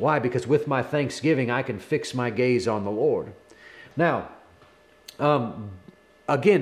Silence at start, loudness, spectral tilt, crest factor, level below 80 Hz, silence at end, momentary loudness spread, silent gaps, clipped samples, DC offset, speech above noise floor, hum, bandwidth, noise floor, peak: 0 s; -25 LUFS; -6.5 dB/octave; 18 dB; -66 dBFS; 0 s; 16 LU; none; under 0.1%; under 0.1%; 32 dB; none; 13.5 kHz; -55 dBFS; -8 dBFS